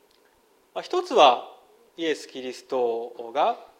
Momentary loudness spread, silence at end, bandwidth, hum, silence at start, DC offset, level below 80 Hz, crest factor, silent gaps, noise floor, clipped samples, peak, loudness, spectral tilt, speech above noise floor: 18 LU; 0.15 s; 13.5 kHz; none; 0.75 s; under 0.1%; -78 dBFS; 24 dB; none; -62 dBFS; under 0.1%; -2 dBFS; -24 LUFS; -2.5 dB/octave; 38 dB